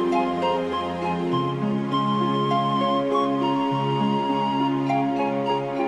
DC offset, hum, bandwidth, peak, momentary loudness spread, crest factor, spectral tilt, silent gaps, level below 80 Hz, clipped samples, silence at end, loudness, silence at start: under 0.1%; none; 10 kHz; -10 dBFS; 3 LU; 12 dB; -7.5 dB/octave; none; -58 dBFS; under 0.1%; 0 s; -23 LUFS; 0 s